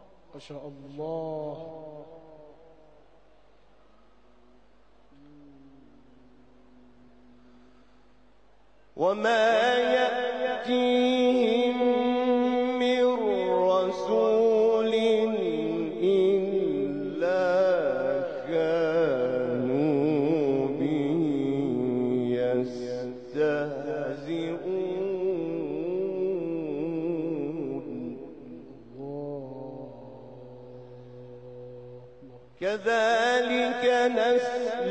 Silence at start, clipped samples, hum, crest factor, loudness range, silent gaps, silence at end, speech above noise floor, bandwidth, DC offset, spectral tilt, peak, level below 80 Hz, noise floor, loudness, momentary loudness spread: 0.35 s; under 0.1%; none; 16 dB; 16 LU; none; 0 s; 35 dB; 8.8 kHz; 0.2%; -6 dB/octave; -12 dBFS; -66 dBFS; -61 dBFS; -26 LUFS; 21 LU